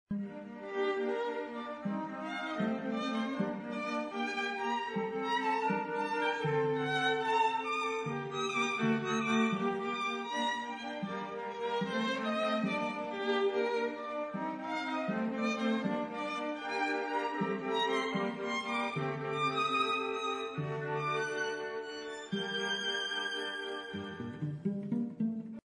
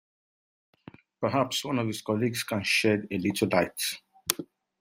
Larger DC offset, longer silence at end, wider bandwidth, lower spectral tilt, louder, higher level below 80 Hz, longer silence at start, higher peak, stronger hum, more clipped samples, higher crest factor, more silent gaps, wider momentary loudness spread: neither; second, 0.05 s vs 0.35 s; second, 10.5 kHz vs 16 kHz; about the same, -5 dB/octave vs -4 dB/octave; second, -34 LUFS vs -28 LUFS; second, -76 dBFS vs -68 dBFS; second, 0.1 s vs 1.2 s; second, -18 dBFS vs -2 dBFS; neither; neither; second, 16 dB vs 28 dB; neither; about the same, 8 LU vs 8 LU